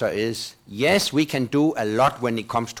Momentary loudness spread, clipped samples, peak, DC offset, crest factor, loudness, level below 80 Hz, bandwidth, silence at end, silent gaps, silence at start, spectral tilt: 8 LU; under 0.1%; -10 dBFS; under 0.1%; 12 dB; -22 LUFS; -56 dBFS; 18.5 kHz; 0 s; none; 0 s; -4.5 dB/octave